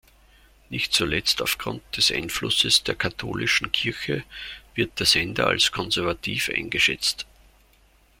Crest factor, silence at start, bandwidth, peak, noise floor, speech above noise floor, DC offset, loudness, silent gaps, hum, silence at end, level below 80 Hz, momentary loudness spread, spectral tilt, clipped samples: 22 dB; 0.7 s; 16.5 kHz; -4 dBFS; -58 dBFS; 34 dB; under 0.1%; -22 LUFS; none; none; 0.95 s; -50 dBFS; 11 LU; -2 dB/octave; under 0.1%